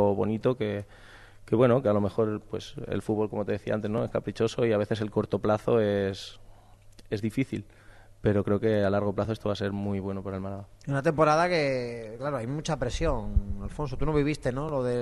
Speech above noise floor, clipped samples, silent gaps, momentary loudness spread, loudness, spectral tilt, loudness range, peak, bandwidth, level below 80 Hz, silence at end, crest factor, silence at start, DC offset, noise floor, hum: 24 dB; under 0.1%; none; 11 LU; -28 LUFS; -7 dB/octave; 2 LU; -10 dBFS; 12 kHz; -42 dBFS; 0 s; 18 dB; 0 s; under 0.1%; -52 dBFS; none